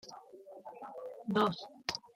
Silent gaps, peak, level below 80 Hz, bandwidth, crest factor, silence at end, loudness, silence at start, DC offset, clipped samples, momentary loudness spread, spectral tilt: none; -16 dBFS; -76 dBFS; 16 kHz; 24 dB; 0.1 s; -36 LUFS; 0.05 s; under 0.1%; under 0.1%; 20 LU; -5 dB/octave